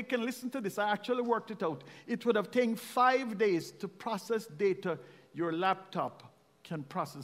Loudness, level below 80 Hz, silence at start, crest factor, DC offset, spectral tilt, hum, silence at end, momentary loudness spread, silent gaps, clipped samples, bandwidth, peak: -33 LUFS; -82 dBFS; 0 s; 20 dB; under 0.1%; -5.5 dB/octave; none; 0 s; 12 LU; none; under 0.1%; 16 kHz; -14 dBFS